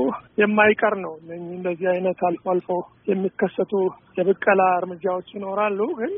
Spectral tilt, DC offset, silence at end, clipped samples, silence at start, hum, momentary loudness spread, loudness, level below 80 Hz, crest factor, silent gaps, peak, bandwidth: -1 dB/octave; under 0.1%; 0 s; under 0.1%; 0 s; none; 12 LU; -22 LUFS; -66 dBFS; 20 dB; none; -2 dBFS; 3.7 kHz